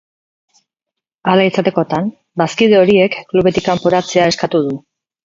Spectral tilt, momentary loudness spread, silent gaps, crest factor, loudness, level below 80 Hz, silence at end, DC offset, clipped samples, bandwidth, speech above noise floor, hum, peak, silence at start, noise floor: -5.5 dB/octave; 10 LU; none; 14 dB; -14 LUFS; -50 dBFS; 0.45 s; under 0.1%; under 0.1%; 7.6 kHz; 69 dB; none; 0 dBFS; 1.25 s; -82 dBFS